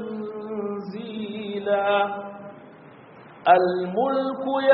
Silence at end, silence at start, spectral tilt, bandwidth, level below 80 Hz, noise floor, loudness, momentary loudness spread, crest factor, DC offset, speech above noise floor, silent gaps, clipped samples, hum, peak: 0 s; 0 s; -3.5 dB/octave; 4.8 kHz; -72 dBFS; -47 dBFS; -24 LUFS; 15 LU; 22 dB; under 0.1%; 26 dB; none; under 0.1%; none; -4 dBFS